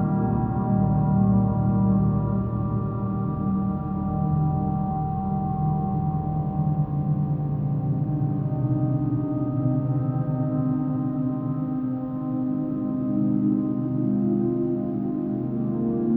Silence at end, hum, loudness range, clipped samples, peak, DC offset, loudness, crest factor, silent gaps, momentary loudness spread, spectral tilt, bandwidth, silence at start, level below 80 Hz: 0 s; none; 3 LU; under 0.1%; -10 dBFS; under 0.1%; -25 LUFS; 14 dB; none; 5 LU; -14 dB/octave; 2.6 kHz; 0 s; -42 dBFS